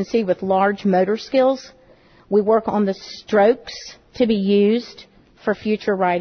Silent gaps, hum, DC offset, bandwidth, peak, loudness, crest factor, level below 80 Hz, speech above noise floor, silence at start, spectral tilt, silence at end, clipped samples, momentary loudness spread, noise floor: none; none; under 0.1%; 6.6 kHz; -4 dBFS; -19 LUFS; 14 dB; -56 dBFS; 32 dB; 0 s; -6.5 dB/octave; 0 s; under 0.1%; 12 LU; -51 dBFS